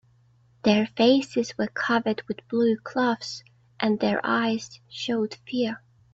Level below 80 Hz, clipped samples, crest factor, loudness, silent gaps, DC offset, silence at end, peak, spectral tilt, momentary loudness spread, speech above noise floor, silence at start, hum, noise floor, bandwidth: -66 dBFS; under 0.1%; 18 dB; -25 LUFS; none; under 0.1%; 0.35 s; -8 dBFS; -5 dB/octave; 11 LU; 35 dB; 0.65 s; none; -60 dBFS; 8 kHz